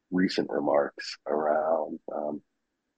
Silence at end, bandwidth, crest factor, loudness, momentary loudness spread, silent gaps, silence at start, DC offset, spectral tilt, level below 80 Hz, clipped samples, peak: 0.6 s; 9 kHz; 18 dB; -29 LUFS; 10 LU; none; 0.1 s; under 0.1%; -6 dB/octave; -74 dBFS; under 0.1%; -12 dBFS